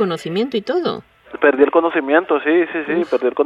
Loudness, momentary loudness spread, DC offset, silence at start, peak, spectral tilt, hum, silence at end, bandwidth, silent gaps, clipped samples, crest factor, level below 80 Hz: -17 LUFS; 7 LU; under 0.1%; 0 s; 0 dBFS; -6.5 dB/octave; none; 0 s; 11.5 kHz; none; under 0.1%; 16 dB; -62 dBFS